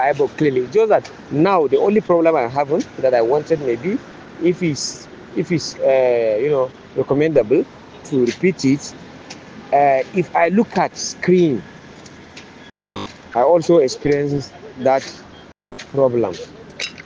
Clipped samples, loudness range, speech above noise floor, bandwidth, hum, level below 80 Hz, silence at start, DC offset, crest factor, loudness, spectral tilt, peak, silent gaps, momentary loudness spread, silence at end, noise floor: under 0.1%; 3 LU; 27 dB; 10 kHz; none; -56 dBFS; 0 s; under 0.1%; 16 dB; -18 LUFS; -6 dB/octave; -2 dBFS; none; 20 LU; 0.05 s; -43 dBFS